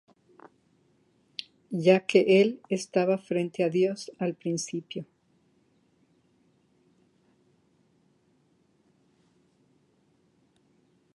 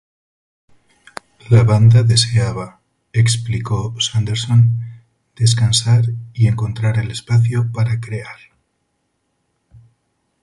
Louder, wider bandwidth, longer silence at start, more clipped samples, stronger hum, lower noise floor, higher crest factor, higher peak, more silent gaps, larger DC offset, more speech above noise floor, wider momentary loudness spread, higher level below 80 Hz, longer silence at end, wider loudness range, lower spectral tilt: second, -26 LUFS vs -16 LUFS; about the same, 11.5 kHz vs 11.5 kHz; first, 1.7 s vs 1.45 s; neither; neither; about the same, -68 dBFS vs -69 dBFS; first, 24 dB vs 16 dB; second, -8 dBFS vs 0 dBFS; neither; neither; second, 42 dB vs 54 dB; first, 20 LU vs 17 LU; second, -80 dBFS vs -42 dBFS; first, 6.1 s vs 2.1 s; first, 14 LU vs 6 LU; about the same, -5.5 dB/octave vs -5 dB/octave